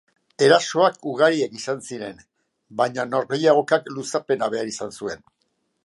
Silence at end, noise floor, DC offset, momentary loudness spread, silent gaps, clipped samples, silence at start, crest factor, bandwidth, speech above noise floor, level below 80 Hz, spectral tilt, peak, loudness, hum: 0.7 s; -72 dBFS; under 0.1%; 16 LU; none; under 0.1%; 0.4 s; 20 dB; 11.5 kHz; 50 dB; -68 dBFS; -4 dB/octave; -2 dBFS; -21 LUFS; none